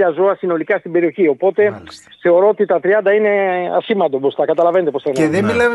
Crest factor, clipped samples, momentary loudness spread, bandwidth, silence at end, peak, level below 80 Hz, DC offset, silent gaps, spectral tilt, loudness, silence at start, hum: 12 dB; under 0.1%; 5 LU; 12 kHz; 0 s; -4 dBFS; -56 dBFS; under 0.1%; none; -6.5 dB/octave; -15 LUFS; 0 s; none